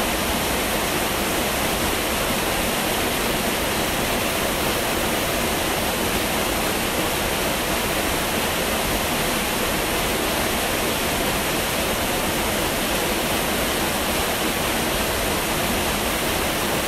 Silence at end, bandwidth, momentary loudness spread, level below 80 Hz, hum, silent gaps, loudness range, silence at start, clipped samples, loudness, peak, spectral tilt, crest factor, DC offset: 0 s; 16 kHz; 0 LU; -36 dBFS; none; none; 0 LU; 0 s; under 0.1%; -21 LUFS; -8 dBFS; -2.5 dB/octave; 14 dB; under 0.1%